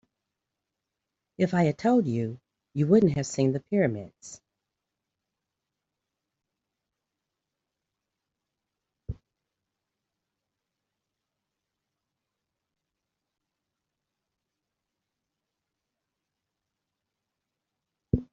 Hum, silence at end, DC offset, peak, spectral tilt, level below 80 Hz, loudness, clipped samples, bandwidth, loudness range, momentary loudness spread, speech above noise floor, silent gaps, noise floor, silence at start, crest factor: none; 0.1 s; under 0.1%; -8 dBFS; -8 dB/octave; -58 dBFS; -26 LUFS; under 0.1%; 8 kHz; 9 LU; 23 LU; 61 dB; none; -86 dBFS; 1.4 s; 24 dB